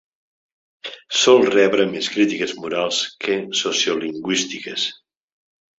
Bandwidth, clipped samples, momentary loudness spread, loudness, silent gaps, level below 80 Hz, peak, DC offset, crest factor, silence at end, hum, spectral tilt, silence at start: 8 kHz; under 0.1%; 12 LU; -19 LUFS; none; -66 dBFS; -2 dBFS; under 0.1%; 20 dB; 0.85 s; none; -2.5 dB/octave; 0.85 s